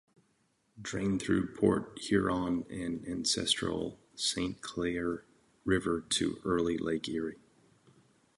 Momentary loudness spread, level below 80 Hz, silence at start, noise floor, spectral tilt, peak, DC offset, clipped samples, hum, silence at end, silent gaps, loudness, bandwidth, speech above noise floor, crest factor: 9 LU; -56 dBFS; 0.75 s; -74 dBFS; -4 dB/octave; -12 dBFS; under 0.1%; under 0.1%; none; 1 s; none; -33 LUFS; 11.5 kHz; 42 dB; 22 dB